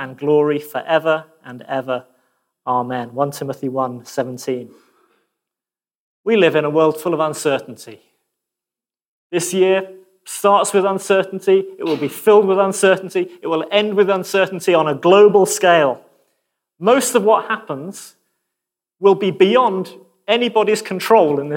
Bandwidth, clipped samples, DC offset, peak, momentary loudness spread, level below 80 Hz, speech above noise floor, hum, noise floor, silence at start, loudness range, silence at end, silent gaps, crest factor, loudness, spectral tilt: 17 kHz; under 0.1%; under 0.1%; -2 dBFS; 13 LU; -74 dBFS; over 74 dB; none; under -90 dBFS; 0 s; 9 LU; 0 s; 5.95-6.24 s, 9.08-9.30 s; 16 dB; -16 LUFS; -4.5 dB/octave